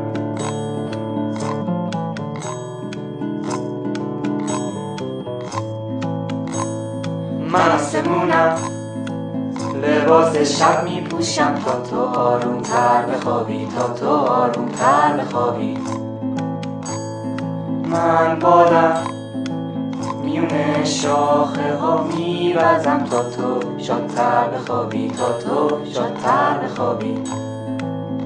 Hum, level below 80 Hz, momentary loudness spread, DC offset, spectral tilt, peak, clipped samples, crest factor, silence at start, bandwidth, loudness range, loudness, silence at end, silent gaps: none; -60 dBFS; 11 LU; under 0.1%; -5.5 dB/octave; 0 dBFS; under 0.1%; 20 dB; 0 s; 10.5 kHz; 7 LU; -20 LUFS; 0 s; none